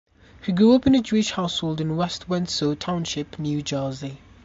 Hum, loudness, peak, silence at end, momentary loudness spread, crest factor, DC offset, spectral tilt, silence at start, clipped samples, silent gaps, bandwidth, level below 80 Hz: none; -23 LUFS; -6 dBFS; 0.3 s; 12 LU; 16 dB; under 0.1%; -5.5 dB/octave; 0.4 s; under 0.1%; none; 8 kHz; -50 dBFS